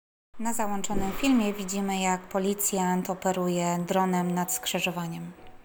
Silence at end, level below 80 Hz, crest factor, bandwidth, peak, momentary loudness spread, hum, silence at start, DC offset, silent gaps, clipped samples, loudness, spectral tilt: 0 s; -48 dBFS; 16 dB; over 20 kHz; -12 dBFS; 7 LU; none; 0.35 s; under 0.1%; none; under 0.1%; -28 LUFS; -4.5 dB/octave